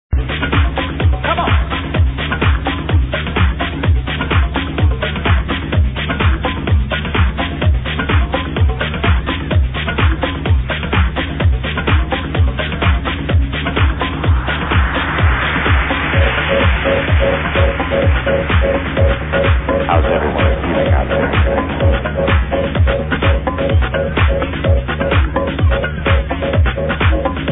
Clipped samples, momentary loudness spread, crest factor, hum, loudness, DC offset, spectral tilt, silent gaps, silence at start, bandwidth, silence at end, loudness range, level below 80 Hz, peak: under 0.1%; 3 LU; 12 dB; none; -15 LUFS; under 0.1%; -10.5 dB/octave; none; 0.1 s; 4 kHz; 0 s; 2 LU; -18 dBFS; -2 dBFS